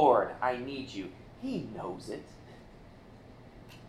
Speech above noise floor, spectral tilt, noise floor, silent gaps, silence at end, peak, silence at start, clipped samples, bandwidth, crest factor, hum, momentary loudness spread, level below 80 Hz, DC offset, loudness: 16 dB; -6.5 dB/octave; -53 dBFS; none; 0 s; -10 dBFS; 0 s; under 0.1%; 13.5 kHz; 24 dB; none; 23 LU; -60 dBFS; under 0.1%; -34 LUFS